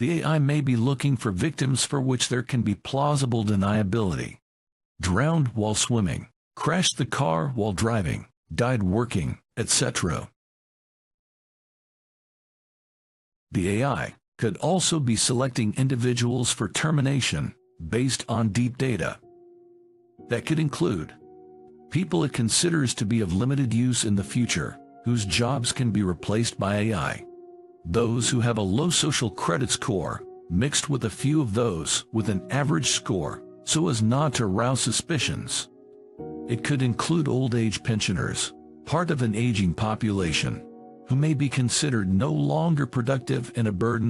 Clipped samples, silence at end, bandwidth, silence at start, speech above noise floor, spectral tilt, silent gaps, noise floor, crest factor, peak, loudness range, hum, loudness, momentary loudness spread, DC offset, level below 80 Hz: under 0.1%; 0 s; 13 kHz; 0 s; 32 dB; -4.5 dB/octave; 4.42-4.95 s, 6.36-6.51 s, 8.37-8.43 s, 10.36-13.47 s, 14.28-14.32 s; -56 dBFS; 16 dB; -8 dBFS; 4 LU; none; -25 LUFS; 8 LU; under 0.1%; -52 dBFS